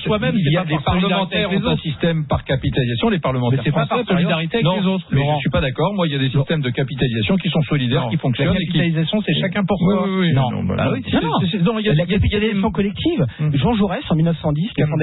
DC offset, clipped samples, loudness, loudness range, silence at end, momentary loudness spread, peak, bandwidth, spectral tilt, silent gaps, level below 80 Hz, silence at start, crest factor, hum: under 0.1%; under 0.1%; -18 LUFS; 1 LU; 0 s; 3 LU; -6 dBFS; 4.1 kHz; -12 dB/octave; none; -38 dBFS; 0 s; 12 dB; none